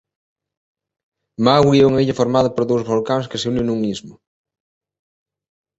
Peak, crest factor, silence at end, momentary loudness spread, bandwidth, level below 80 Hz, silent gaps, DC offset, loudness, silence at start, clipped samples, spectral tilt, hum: -2 dBFS; 18 dB; 1.65 s; 9 LU; 8.2 kHz; -50 dBFS; none; under 0.1%; -17 LUFS; 1.4 s; under 0.1%; -6.5 dB/octave; none